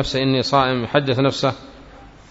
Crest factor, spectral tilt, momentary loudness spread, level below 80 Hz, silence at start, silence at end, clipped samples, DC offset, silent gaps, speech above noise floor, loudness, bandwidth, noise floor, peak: 18 dB; -5.5 dB/octave; 6 LU; -44 dBFS; 0 s; 0.2 s; under 0.1%; under 0.1%; none; 24 dB; -19 LUFS; 8 kHz; -43 dBFS; -2 dBFS